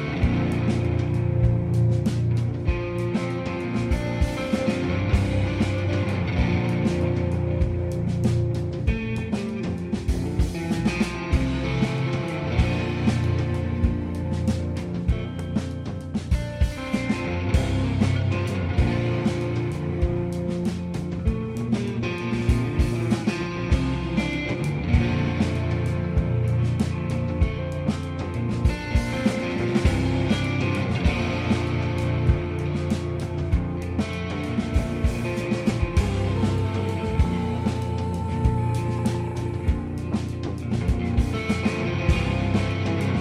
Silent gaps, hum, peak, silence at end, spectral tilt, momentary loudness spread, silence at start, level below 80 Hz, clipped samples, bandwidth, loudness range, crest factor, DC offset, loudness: none; none; -6 dBFS; 0 s; -7 dB/octave; 5 LU; 0 s; -32 dBFS; under 0.1%; 12 kHz; 2 LU; 18 dB; under 0.1%; -25 LUFS